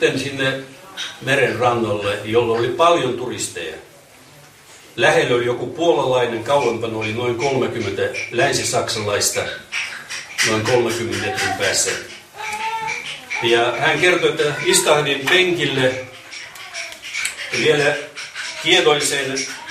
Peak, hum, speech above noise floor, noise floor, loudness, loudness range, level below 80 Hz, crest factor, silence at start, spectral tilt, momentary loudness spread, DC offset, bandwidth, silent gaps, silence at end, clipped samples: 0 dBFS; none; 27 dB; -45 dBFS; -18 LUFS; 4 LU; -56 dBFS; 18 dB; 0 s; -3 dB/octave; 14 LU; under 0.1%; 15.5 kHz; none; 0 s; under 0.1%